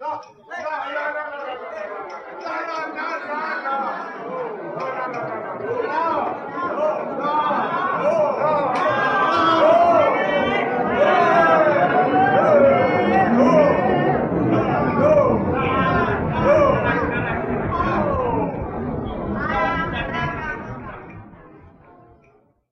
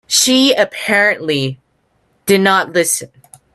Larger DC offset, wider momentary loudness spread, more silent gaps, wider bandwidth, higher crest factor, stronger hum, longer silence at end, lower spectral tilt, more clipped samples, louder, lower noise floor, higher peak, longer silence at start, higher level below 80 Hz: neither; first, 15 LU vs 9 LU; neither; second, 6.8 kHz vs 15.5 kHz; about the same, 16 dB vs 16 dB; neither; first, 1.15 s vs 0.5 s; first, -7.5 dB/octave vs -2.5 dB/octave; neither; second, -19 LUFS vs -13 LUFS; second, -57 dBFS vs -61 dBFS; second, -4 dBFS vs 0 dBFS; about the same, 0 s vs 0.1 s; first, -42 dBFS vs -60 dBFS